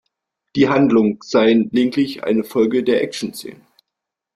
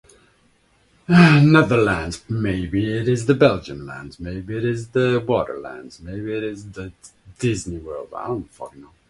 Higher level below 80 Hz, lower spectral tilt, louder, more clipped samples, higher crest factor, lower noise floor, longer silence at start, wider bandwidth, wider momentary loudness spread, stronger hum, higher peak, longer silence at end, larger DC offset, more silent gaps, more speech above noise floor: second, -58 dBFS vs -44 dBFS; about the same, -6 dB/octave vs -7 dB/octave; about the same, -17 LUFS vs -19 LUFS; neither; about the same, 16 dB vs 20 dB; first, -82 dBFS vs -59 dBFS; second, 0.55 s vs 1.1 s; first, 14.5 kHz vs 11.5 kHz; second, 13 LU vs 22 LU; neither; about the same, -2 dBFS vs 0 dBFS; first, 0.8 s vs 0.3 s; neither; neither; first, 66 dB vs 40 dB